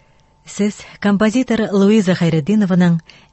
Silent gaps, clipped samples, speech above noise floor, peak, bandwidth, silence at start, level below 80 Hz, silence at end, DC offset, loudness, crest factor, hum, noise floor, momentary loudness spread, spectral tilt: none; under 0.1%; 32 dB; -2 dBFS; 8.6 kHz; 0.45 s; -50 dBFS; 0.3 s; under 0.1%; -16 LUFS; 14 dB; none; -47 dBFS; 8 LU; -7 dB/octave